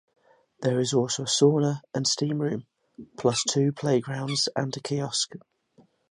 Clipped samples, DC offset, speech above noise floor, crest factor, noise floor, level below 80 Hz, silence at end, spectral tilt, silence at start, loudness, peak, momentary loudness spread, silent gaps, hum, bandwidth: under 0.1%; under 0.1%; 36 dB; 20 dB; -61 dBFS; -70 dBFS; 0.75 s; -4.5 dB/octave; 0.6 s; -26 LUFS; -8 dBFS; 9 LU; none; none; 11 kHz